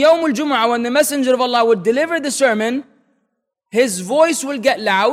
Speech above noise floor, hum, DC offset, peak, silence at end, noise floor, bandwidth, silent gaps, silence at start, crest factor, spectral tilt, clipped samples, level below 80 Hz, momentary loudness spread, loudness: 56 dB; none; under 0.1%; -2 dBFS; 0 s; -72 dBFS; 16 kHz; none; 0 s; 14 dB; -3 dB/octave; under 0.1%; -66 dBFS; 4 LU; -16 LUFS